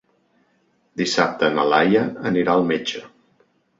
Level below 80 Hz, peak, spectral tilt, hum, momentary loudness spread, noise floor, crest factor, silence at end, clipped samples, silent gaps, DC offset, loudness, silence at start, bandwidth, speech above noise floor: -60 dBFS; -2 dBFS; -5 dB/octave; none; 11 LU; -64 dBFS; 20 dB; 0.7 s; under 0.1%; none; under 0.1%; -19 LUFS; 0.95 s; 8 kHz; 45 dB